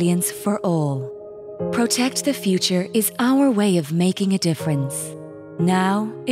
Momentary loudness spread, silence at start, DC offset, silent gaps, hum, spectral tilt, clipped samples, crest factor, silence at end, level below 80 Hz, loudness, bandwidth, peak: 12 LU; 0 s; under 0.1%; none; none; -5 dB/octave; under 0.1%; 14 dB; 0 s; -68 dBFS; -20 LUFS; 16 kHz; -6 dBFS